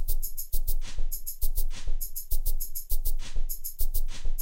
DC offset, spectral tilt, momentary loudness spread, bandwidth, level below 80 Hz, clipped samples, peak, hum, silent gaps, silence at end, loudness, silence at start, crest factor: under 0.1%; -2.5 dB/octave; 3 LU; 16.5 kHz; -26 dBFS; under 0.1%; -12 dBFS; none; none; 0 s; -35 LUFS; 0 s; 12 dB